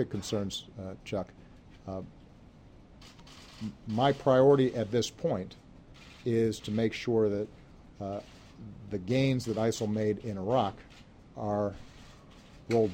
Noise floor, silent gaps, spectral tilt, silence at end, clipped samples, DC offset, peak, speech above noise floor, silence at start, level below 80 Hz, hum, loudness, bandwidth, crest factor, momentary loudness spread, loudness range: -54 dBFS; none; -6.5 dB/octave; 0 s; under 0.1%; under 0.1%; -12 dBFS; 24 dB; 0 s; -58 dBFS; none; -30 LUFS; 16 kHz; 20 dB; 23 LU; 10 LU